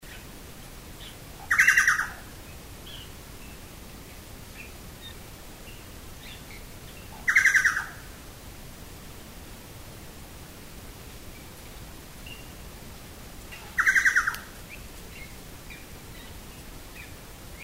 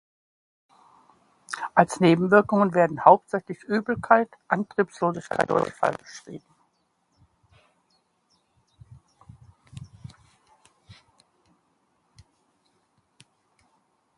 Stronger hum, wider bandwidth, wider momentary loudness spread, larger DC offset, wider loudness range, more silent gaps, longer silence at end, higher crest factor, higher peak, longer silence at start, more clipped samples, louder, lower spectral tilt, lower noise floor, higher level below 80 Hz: neither; first, 16 kHz vs 11.5 kHz; about the same, 24 LU vs 25 LU; neither; first, 17 LU vs 10 LU; neither; second, 0 s vs 4.1 s; about the same, 24 dB vs 26 dB; second, -8 dBFS vs 0 dBFS; second, 0.05 s vs 1.5 s; neither; about the same, -22 LUFS vs -22 LUFS; second, -1.5 dB/octave vs -6.5 dB/octave; second, -44 dBFS vs -71 dBFS; first, -48 dBFS vs -64 dBFS